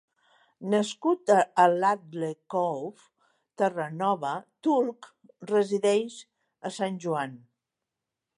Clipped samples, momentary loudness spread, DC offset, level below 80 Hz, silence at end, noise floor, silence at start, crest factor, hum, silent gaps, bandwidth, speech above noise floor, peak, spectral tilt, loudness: under 0.1%; 16 LU; under 0.1%; -82 dBFS; 1 s; -87 dBFS; 0.6 s; 20 dB; none; none; 11.5 kHz; 60 dB; -8 dBFS; -5.5 dB/octave; -27 LUFS